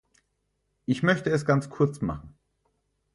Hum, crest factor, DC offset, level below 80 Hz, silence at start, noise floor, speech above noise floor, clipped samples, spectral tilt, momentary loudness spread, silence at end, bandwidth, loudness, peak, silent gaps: 50 Hz at -45 dBFS; 20 dB; under 0.1%; -54 dBFS; 0.9 s; -76 dBFS; 51 dB; under 0.1%; -7 dB/octave; 12 LU; 0.85 s; 11.5 kHz; -26 LUFS; -8 dBFS; none